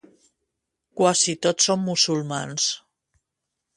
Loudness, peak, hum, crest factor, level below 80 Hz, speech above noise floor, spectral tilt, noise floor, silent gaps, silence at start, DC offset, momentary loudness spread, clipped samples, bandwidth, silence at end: -21 LUFS; -4 dBFS; none; 20 dB; -68 dBFS; 60 dB; -3 dB/octave; -82 dBFS; none; 0.95 s; under 0.1%; 9 LU; under 0.1%; 11.5 kHz; 1 s